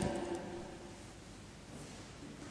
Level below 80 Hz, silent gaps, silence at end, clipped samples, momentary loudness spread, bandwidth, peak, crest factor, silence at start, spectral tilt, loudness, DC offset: -58 dBFS; none; 0 s; under 0.1%; 12 LU; 11 kHz; -22 dBFS; 22 dB; 0 s; -5 dB/octave; -47 LUFS; under 0.1%